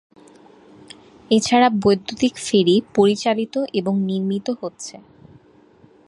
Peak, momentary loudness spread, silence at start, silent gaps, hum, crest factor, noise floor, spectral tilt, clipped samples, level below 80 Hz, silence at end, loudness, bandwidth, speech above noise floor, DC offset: -2 dBFS; 12 LU; 1.3 s; none; none; 18 dB; -51 dBFS; -5 dB/octave; under 0.1%; -58 dBFS; 1.15 s; -19 LUFS; 11.5 kHz; 33 dB; under 0.1%